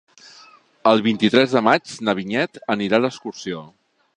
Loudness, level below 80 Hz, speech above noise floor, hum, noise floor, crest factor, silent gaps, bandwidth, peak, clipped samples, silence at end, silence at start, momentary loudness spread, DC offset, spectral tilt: -19 LUFS; -64 dBFS; 30 dB; none; -49 dBFS; 20 dB; none; 10 kHz; 0 dBFS; under 0.1%; 0.5 s; 0.85 s; 14 LU; under 0.1%; -5 dB/octave